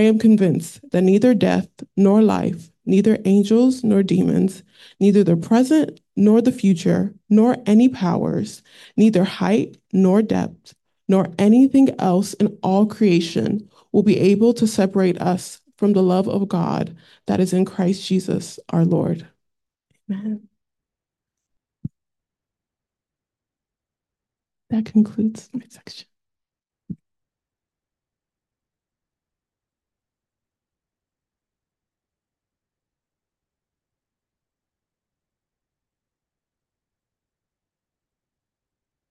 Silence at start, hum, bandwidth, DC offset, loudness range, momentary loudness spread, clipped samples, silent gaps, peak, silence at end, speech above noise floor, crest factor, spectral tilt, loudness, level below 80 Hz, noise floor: 0 s; none; 12.5 kHz; under 0.1%; 10 LU; 14 LU; under 0.1%; none; -4 dBFS; 12.15 s; 71 dB; 16 dB; -7.5 dB/octave; -18 LUFS; -60 dBFS; -88 dBFS